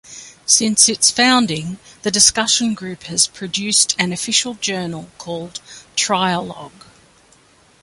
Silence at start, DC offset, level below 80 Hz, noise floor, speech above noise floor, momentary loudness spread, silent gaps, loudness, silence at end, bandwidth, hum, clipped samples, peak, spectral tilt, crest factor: 0.1 s; under 0.1%; -54 dBFS; -52 dBFS; 34 dB; 18 LU; none; -15 LUFS; 1.15 s; 16 kHz; none; under 0.1%; 0 dBFS; -1.5 dB/octave; 20 dB